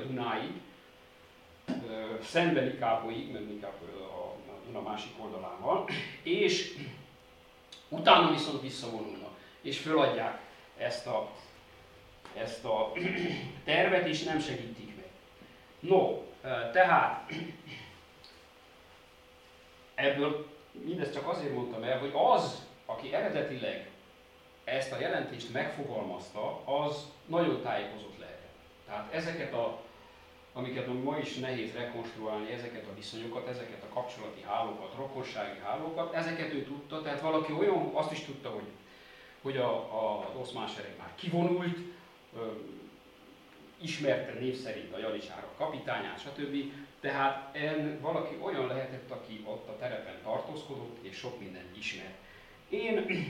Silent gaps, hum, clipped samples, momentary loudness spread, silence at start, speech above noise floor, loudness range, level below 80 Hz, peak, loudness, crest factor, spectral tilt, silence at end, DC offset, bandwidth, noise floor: none; none; under 0.1%; 18 LU; 0 s; 25 dB; 8 LU; -70 dBFS; -6 dBFS; -34 LUFS; 28 dB; -5 dB/octave; 0 s; under 0.1%; 16.5 kHz; -58 dBFS